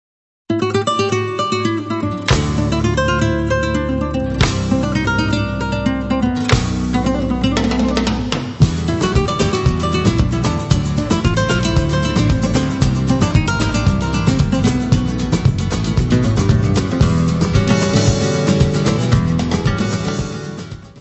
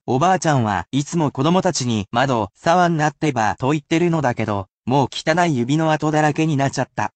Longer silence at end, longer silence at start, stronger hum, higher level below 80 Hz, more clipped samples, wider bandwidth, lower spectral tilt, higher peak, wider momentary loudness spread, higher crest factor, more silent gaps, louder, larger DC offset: about the same, 0 s vs 0.05 s; first, 0.5 s vs 0.05 s; neither; first, -26 dBFS vs -54 dBFS; neither; about the same, 8.4 kHz vs 9 kHz; about the same, -6 dB/octave vs -5.5 dB/octave; first, 0 dBFS vs -4 dBFS; about the same, 4 LU vs 5 LU; about the same, 16 dB vs 14 dB; second, none vs 4.73-4.82 s; about the same, -17 LUFS vs -19 LUFS; neither